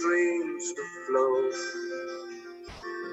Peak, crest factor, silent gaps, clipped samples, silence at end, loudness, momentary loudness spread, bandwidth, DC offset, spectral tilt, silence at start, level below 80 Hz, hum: -14 dBFS; 16 dB; none; under 0.1%; 0 s; -30 LUFS; 16 LU; 8.4 kHz; under 0.1%; -3 dB/octave; 0 s; -64 dBFS; none